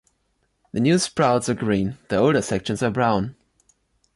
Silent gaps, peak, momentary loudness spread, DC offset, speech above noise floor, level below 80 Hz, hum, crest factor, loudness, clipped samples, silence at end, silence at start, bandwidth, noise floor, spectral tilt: none; -6 dBFS; 6 LU; under 0.1%; 49 dB; -50 dBFS; none; 16 dB; -21 LUFS; under 0.1%; 0.85 s; 0.75 s; 11.5 kHz; -69 dBFS; -5.5 dB/octave